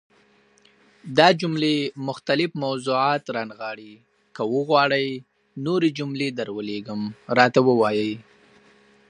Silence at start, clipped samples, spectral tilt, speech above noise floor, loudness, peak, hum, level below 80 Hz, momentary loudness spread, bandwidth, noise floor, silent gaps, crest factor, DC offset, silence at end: 1.05 s; under 0.1%; -5.5 dB/octave; 37 dB; -22 LUFS; 0 dBFS; none; -70 dBFS; 14 LU; 11 kHz; -59 dBFS; none; 22 dB; under 0.1%; 0.9 s